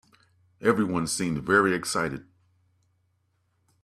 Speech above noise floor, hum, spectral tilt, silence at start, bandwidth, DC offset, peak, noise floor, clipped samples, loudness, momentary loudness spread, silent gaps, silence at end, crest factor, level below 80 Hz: 47 dB; none; -4.5 dB/octave; 0.6 s; 14 kHz; under 0.1%; -6 dBFS; -72 dBFS; under 0.1%; -25 LUFS; 8 LU; none; 1.6 s; 22 dB; -60 dBFS